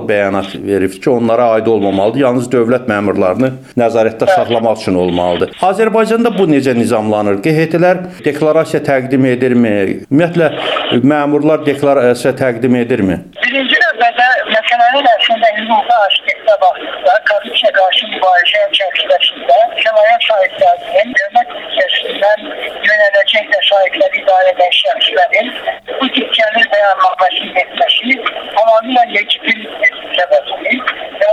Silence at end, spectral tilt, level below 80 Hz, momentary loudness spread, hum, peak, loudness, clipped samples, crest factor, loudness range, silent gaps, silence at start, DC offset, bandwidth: 0 s; -5 dB/octave; -54 dBFS; 6 LU; none; 0 dBFS; -11 LUFS; under 0.1%; 10 dB; 2 LU; none; 0 s; under 0.1%; 13 kHz